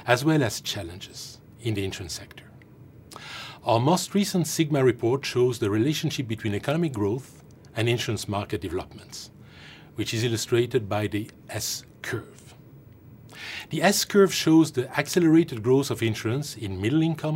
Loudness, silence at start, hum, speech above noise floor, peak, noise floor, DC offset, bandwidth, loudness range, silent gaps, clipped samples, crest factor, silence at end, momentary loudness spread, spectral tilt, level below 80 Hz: -25 LUFS; 0 s; none; 24 dB; -4 dBFS; -49 dBFS; under 0.1%; 16 kHz; 8 LU; none; under 0.1%; 22 dB; 0 s; 19 LU; -5 dB/octave; -60 dBFS